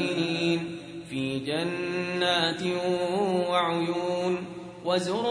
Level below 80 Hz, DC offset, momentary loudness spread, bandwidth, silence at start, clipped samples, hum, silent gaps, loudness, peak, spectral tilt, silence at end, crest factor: -66 dBFS; under 0.1%; 8 LU; 10.5 kHz; 0 s; under 0.1%; none; none; -27 LUFS; -10 dBFS; -5 dB/octave; 0 s; 16 dB